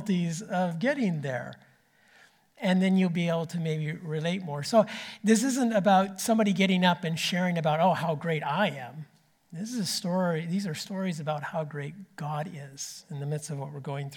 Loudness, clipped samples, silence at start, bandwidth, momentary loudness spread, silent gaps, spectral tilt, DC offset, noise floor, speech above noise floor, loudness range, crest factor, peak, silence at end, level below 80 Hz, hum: -28 LUFS; under 0.1%; 0 s; 18 kHz; 14 LU; none; -5.5 dB/octave; under 0.1%; -62 dBFS; 34 dB; 7 LU; 18 dB; -10 dBFS; 0 s; -78 dBFS; none